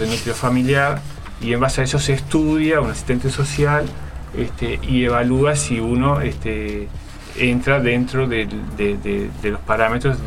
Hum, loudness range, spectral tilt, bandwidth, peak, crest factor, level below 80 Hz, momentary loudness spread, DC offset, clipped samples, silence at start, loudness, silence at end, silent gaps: none; 2 LU; -5.5 dB/octave; 15 kHz; 0 dBFS; 18 dB; -32 dBFS; 11 LU; under 0.1%; under 0.1%; 0 s; -19 LUFS; 0 s; none